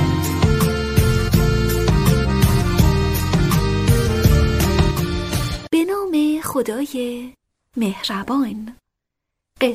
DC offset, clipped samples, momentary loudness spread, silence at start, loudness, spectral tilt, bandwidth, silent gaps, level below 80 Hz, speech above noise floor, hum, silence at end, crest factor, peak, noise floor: under 0.1%; under 0.1%; 8 LU; 0 s; -18 LUFS; -6 dB/octave; 16 kHz; none; -26 dBFS; 57 dB; none; 0 s; 16 dB; -2 dBFS; -80 dBFS